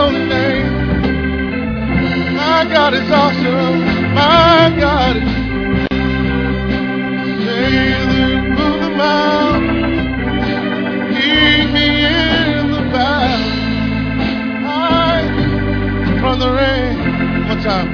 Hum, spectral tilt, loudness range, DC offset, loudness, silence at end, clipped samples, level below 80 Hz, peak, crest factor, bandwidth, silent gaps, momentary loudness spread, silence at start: none; -6.5 dB/octave; 4 LU; under 0.1%; -14 LUFS; 0 s; under 0.1%; -26 dBFS; 0 dBFS; 14 dB; 5.4 kHz; none; 7 LU; 0 s